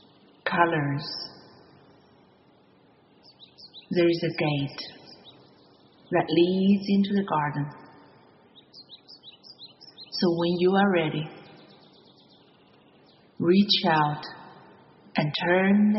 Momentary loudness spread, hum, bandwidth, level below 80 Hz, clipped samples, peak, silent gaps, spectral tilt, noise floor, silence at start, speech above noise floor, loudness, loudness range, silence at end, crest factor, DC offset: 25 LU; none; 6 kHz; -68 dBFS; under 0.1%; -6 dBFS; none; -4.5 dB/octave; -59 dBFS; 0.45 s; 36 dB; -25 LUFS; 6 LU; 0 s; 20 dB; under 0.1%